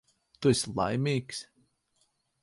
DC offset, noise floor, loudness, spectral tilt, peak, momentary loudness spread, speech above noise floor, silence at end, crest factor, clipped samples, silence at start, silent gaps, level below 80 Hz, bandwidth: under 0.1%; -74 dBFS; -29 LUFS; -5 dB/octave; -12 dBFS; 12 LU; 45 dB; 1 s; 20 dB; under 0.1%; 0.4 s; none; -60 dBFS; 11.5 kHz